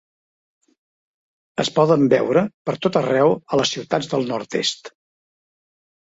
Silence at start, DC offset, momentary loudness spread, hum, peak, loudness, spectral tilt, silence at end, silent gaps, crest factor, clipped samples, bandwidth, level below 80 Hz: 1.6 s; under 0.1%; 8 LU; none; -2 dBFS; -19 LUFS; -5 dB/octave; 1.25 s; 2.54-2.65 s; 18 dB; under 0.1%; 8 kHz; -62 dBFS